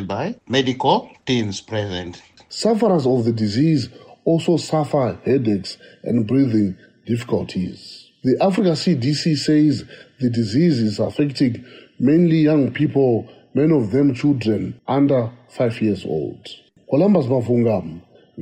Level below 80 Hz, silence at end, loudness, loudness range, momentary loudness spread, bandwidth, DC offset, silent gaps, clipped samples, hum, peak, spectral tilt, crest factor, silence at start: -58 dBFS; 0 s; -19 LUFS; 3 LU; 11 LU; 10.5 kHz; under 0.1%; none; under 0.1%; none; -4 dBFS; -7 dB/octave; 16 dB; 0 s